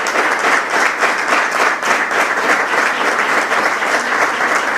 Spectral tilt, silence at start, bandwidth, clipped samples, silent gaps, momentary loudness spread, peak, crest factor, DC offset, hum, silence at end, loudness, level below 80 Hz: -1 dB/octave; 0 s; 16 kHz; under 0.1%; none; 2 LU; 0 dBFS; 16 dB; under 0.1%; none; 0 s; -14 LUFS; -58 dBFS